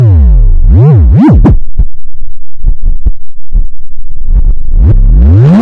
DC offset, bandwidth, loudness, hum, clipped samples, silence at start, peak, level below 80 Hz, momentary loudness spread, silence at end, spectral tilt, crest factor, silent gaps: under 0.1%; 3 kHz; -8 LUFS; none; 0.5%; 0 s; 0 dBFS; -6 dBFS; 14 LU; 0 s; -11 dB/octave; 2 dB; none